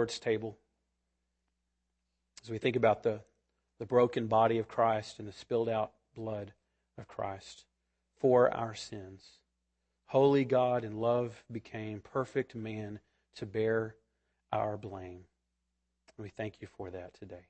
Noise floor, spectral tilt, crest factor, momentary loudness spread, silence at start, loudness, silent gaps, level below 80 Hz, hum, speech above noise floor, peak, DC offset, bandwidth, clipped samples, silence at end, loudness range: -83 dBFS; -6.5 dB/octave; 22 dB; 19 LU; 0 s; -32 LUFS; none; -70 dBFS; none; 50 dB; -14 dBFS; under 0.1%; 8.8 kHz; under 0.1%; 0.1 s; 7 LU